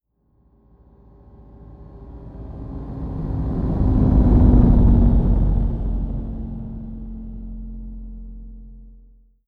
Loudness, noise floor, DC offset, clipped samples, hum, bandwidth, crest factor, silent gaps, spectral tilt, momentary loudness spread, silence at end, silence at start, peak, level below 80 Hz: -19 LUFS; -61 dBFS; under 0.1%; under 0.1%; none; 2.1 kHz; 18 dB; none; -12 dB/octave; 25 LU; 0.55 s; 1.6 s; -2 dBFS; -22 dBFS